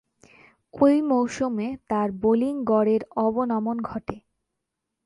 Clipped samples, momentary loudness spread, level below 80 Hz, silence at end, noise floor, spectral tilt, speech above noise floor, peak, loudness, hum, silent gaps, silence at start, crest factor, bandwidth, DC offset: under 0.1%; 11 LU; -58 dBFS; 0.9 s; -82 dBFS; -7 dB/octave; 59 dB; -6 dBFS; -24 LUFS; none; none; 0.75 s; 18 dB; 11 kHz; under 0.1%